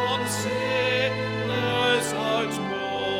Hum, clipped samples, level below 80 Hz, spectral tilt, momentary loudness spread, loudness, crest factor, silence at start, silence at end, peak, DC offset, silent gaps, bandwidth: none; under 0.1%; -58 dBFS; -4 dB/octave; 5 LU; -25 LUFS; 14 dB; 0 s; 0 s; -10 dBFS; under 0.1%; none; 17 kHz